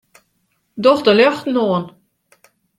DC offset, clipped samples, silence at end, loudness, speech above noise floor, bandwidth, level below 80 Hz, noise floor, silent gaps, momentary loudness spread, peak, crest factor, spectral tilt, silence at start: under 0.1%; under 0.1%; 0.9 s; -15 LUFS; 52 dB; 12 kHz; -62 dBFS; -66 dBFS; none; 18 LU; -2 dBFS; 16 dB; -6 dB/octave; 0.75 s